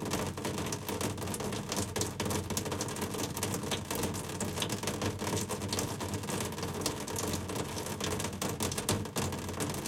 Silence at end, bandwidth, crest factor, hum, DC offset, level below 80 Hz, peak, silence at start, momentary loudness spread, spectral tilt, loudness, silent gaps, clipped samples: 0 s; 17 kHz; 22 dB; none; under 0.1%; -56 dBFS; -12 dBFS; 0 s; 3 LU; -4 dB/octave; -35 LUFS; none; under 0.1%